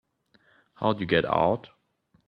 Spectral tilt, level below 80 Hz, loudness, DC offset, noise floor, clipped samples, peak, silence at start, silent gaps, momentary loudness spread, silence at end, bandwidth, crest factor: -8.5 dB/octave; -60 dBFS; -26 LUFS; under 0.1%; -68 dBFS; under 0.1%; -8 dBFS; 0.8 s; none; 6 LU; 0.6 s; 5.6 kHz; 22 dB